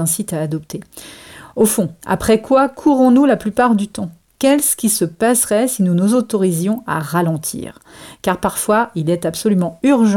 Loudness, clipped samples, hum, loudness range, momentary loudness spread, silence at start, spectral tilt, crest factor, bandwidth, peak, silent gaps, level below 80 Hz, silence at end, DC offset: -16 LUFS; under 0.1%; none; 4 LU; 15 LU; 0 s; -5 dB/octave; 12 dB; 18 kHz; -4 dBFS; none; -48 dBFS; 0 s; under 0.1%